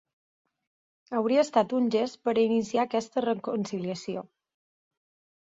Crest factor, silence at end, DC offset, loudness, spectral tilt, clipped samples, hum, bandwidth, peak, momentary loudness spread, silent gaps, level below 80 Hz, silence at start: 20 dB; 1.2 s; under 0.1%; -27 LUFS; -5.5 dB/octave; under 0.1%; none; 7.8 kHz; -10 dBFS; 9 LU; none; -72 dBFS; 1.1 s